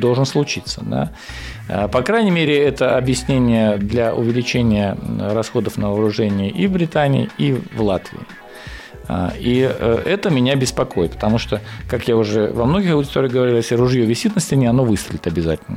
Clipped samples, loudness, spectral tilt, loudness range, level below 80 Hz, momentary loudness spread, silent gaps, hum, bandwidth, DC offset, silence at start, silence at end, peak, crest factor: under 0.1%; -18 LUFS; -6 dB/octave; 3 LU; -38 dBFS; 9 LU; none; none; 16 kHz; under 0.1%; 0 s; 0 s; -6 dBFS; 12 dB